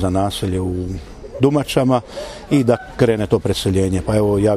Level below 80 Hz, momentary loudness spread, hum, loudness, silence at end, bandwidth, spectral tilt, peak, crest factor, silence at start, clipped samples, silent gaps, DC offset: -38 dBFS; 12 LU; none; -18 LUFS; 0 s; 15 kHz; -6.5 dB/octave; 0 dBFS; 16 dB; 0 s; under 0.1%; none; under 0.1%